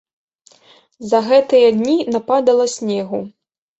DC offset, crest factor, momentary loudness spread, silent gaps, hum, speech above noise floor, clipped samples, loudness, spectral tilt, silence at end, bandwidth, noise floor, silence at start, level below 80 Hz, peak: under 0.1%; 14 dB; 13 LU; none; none; 36 dB; under 0.1%; -15 LUFS; -5 dB/octave; 0.5 s; 8.2 kHz; -50 dBFS; 1 s; -62 dBFS; -2 dBFS